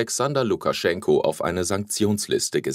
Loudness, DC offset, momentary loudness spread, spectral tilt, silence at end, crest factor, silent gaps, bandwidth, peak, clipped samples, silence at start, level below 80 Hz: -23 LUFS; under 0.1%; 3 LU; -4 dB/octave; 0 s; 16 dB; none; 16 kHz; -6 dBFS; under 0.1%; 0 s; -56 dBFS